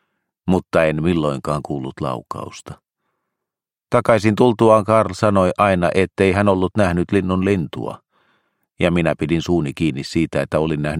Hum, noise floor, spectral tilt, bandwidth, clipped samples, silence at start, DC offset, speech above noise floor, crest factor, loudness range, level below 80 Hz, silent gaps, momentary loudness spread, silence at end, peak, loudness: none; -85 dBFS; -7 dB/octave; 12 kHz; under 0.1%; 0.45 s; under 0.1%; 68 dB; 18 dB; 7 LU; -44 dBFS; none; 13 LU; 0 s; 0 dBFS; -18 LUFS